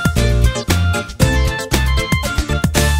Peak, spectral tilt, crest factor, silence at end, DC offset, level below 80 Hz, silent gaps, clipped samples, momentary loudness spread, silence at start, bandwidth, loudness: 0 dBFS; -4.5 dB/octave; 14 dB; 0 s; under 0.1%; -18 dBFS; none; under 0.1%; 3 LU; 0 s; 16.5 kHz; -16 LUFS